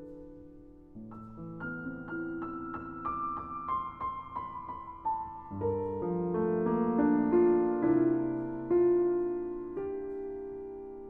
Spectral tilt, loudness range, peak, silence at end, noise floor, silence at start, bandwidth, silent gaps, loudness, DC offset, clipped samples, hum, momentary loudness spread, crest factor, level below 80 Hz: -11.5 dB/octave; 10 LU; -16 dBFS; 0 s; -52 dBFS; 0 s; 3.4 kHz; none; -32 LUFS; under 0.1%; under 0.1%; none; 18 LU; 16 dB; -58 dBFS